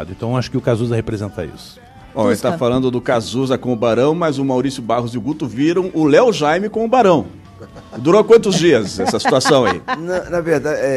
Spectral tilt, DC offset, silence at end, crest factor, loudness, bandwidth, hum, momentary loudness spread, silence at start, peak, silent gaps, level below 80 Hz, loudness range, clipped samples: -5.5 dB/octave; under 0.1%; 0 s; 16 dB; -16 LUFS; 13.5 kHz; none; 10 LU; 0 s; 0 dBFS; none; -44 dBFS; 5 LU; under 0.1%